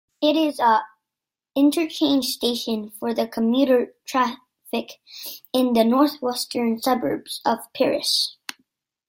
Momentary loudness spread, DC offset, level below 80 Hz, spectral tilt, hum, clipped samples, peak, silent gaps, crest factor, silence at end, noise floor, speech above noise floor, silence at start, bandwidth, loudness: 11 LU; under 0.1%; -66 dBFS; -3.5 dB/octave; none; under 0.1%; -4 dBFS; none; 18 dB; 0.75 s; -87 dBFS; 66 dB; 0.2 s; 17 kHz; -22 LUFS